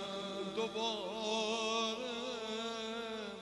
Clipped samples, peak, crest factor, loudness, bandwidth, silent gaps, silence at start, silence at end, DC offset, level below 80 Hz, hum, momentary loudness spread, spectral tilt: under 0.1%; -24 dBFS; 16 dB; -38 LUFS; 11.5 kHz; none; 0 s; 0 s; under 0.1%; -74 dBFS; 50 Hz at -75 dBFS; 6 LU; -2.5 dB/octave